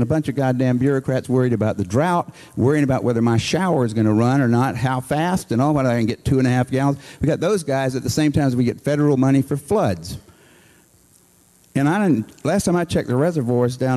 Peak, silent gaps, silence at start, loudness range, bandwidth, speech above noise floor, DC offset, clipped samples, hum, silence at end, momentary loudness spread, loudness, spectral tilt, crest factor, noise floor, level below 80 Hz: -6 dBFS; none; 0 s; 4 LU; 13 kHz; 36 dB; under 0.1%; under 0.1%; none; 0 s; 4 LU; -19 LUFS; -7 dB/octave; 14 dB; -54 dBFS; -46 dBFS